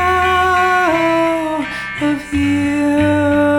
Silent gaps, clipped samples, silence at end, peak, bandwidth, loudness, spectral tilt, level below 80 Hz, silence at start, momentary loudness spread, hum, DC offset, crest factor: none; under 0.1%; 0 s; -4 dBFS; 17 kHz; -15 LUFS; -5.5 dB/octave; -38 dBFS; 0 s; 7 LU; none; under 0.1%; 10 dB